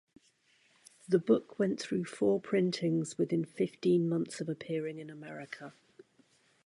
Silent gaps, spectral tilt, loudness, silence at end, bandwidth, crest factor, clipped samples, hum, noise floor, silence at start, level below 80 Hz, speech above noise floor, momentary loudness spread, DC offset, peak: none; -6.5 dB/octave; -32 LUFS; 0.95 s; 11.5 kHz; 20 dB; under 0.1%; none; -69 dBFS; 1.1 s; -78 dBFS; 37 dB; 16 LU; under 0.1%; -14 dBFS